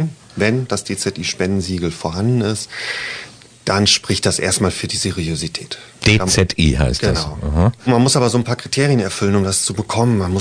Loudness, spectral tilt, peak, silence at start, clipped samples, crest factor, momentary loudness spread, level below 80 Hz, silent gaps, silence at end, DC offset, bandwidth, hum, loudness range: -17 LUFS; -4.5 dB/octave; -2 dBFS; 0 s; under 0.1%; 16 dB; 9 LU; -32 dBFS; none; 0 s; under 0.1%; 10.5 kHz; none; 4 LU